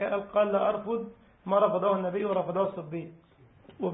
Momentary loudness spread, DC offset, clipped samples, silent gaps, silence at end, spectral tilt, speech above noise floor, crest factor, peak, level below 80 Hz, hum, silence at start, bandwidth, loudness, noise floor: 14 LU; under 0.1%; under 0.1%; none; 0 s; -10.5 dB/octave; 28 dB; 18 dB; -10 dBFS; -66 dBFS; none; 0 s; 3.9 kHz; -28 LUFS; -56 dBFS